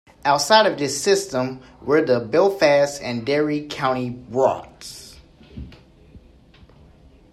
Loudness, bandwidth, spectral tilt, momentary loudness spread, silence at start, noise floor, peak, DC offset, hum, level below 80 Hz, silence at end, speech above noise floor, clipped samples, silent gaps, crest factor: -20 LUFS; 14.5 kHz; -4 dB/octave; 21 LU; 0.25 s; -49 dBFS; -2 dBFS; under 0.1%; none; -52 dBFS; 1.15 s; 30 dB; under 0.1%; none; 20 dB